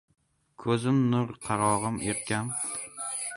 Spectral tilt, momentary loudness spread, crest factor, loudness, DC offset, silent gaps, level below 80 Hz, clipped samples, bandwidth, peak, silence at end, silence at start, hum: -5 dB/octave; 8 LU; 18 dB; -29 LUFS; under 0.1%; none; -60 dBFS; under 0.1%; 11.5 kHz; -10 dBFS; 0 s; 0.6 s; none